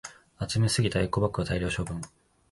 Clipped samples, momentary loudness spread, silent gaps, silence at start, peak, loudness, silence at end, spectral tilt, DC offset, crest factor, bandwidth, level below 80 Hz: under 0.1%; 14 LU; none; 0.05 s; -12 dBFS; -28 LUFS; 0.45 s; -5 dB/octave; under 0.1%; 18 dB; 11.5 kHz; -44 dBFS